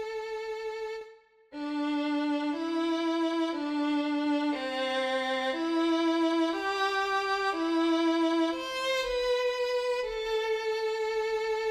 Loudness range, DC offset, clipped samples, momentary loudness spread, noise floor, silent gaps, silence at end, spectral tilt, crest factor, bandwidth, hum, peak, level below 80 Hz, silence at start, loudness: 3 LU; under 0.1%; under 0.1%; 9 LU; -54 dBFS; none; 0 s; -2.5 dB/octave; 12 dB; 12.5 kHz; none; -18 dBFS; -62 dBFS; 0 s; -29 LUFS